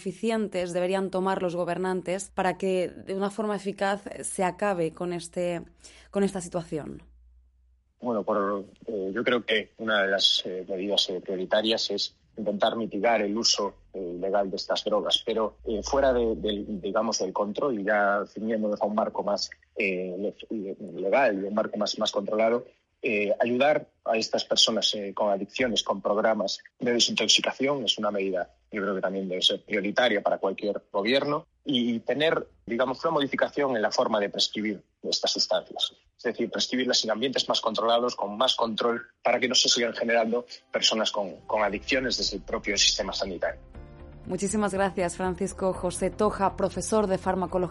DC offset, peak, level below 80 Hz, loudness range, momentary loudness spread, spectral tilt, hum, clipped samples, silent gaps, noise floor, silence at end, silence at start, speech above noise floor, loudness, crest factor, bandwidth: under 0.1%; -6 dBFS; -54 dBFS; 5 LU; 10 LU; -3 dB/octave; none; under 0.1%; none; -64 dBFS; 0 s; 0 s; 37 dB; -26 LUFS; 20 dB; 11.5 kHz